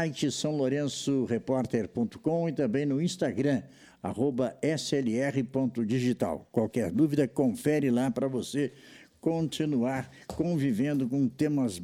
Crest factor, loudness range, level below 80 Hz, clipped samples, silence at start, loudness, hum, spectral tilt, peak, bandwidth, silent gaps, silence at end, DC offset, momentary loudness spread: 16 dB; 2 LU; -62 dBFS; under 0.1%; 0 s; -29 LUFS; none; -6 dB/octave; -12 dBFS; 15.5 kHz; none; 0 s; under 0.1%; 5 LU